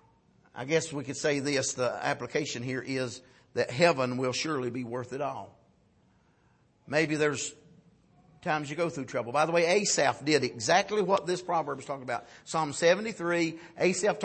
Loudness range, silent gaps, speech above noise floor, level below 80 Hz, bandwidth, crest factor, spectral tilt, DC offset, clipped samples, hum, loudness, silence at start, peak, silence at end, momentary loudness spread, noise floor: 6 LU; none; 37 dB; -70 dBFS; 8.8 kHz; 22 dB; -4 dB/octave; under 0.1%; under 0.1%; none; -29 LUFS; 0.55 s; -8 dBFS; 0 s; 11 LU; -66 dBFS